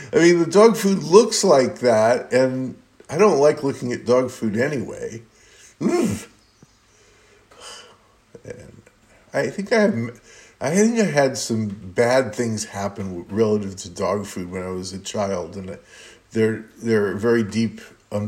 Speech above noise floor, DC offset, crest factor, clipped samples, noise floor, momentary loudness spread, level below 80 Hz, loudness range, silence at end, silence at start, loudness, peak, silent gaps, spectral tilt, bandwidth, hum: 36 dB; under 0.1%; 20 dB; under 0.1%; -55 dBFS; 17 LU; -62 dBFS; 12 LU; 0 s; 0 s; -20 LUFS; 0 dBFS; none; -5 dB/octave; 16 kHz; none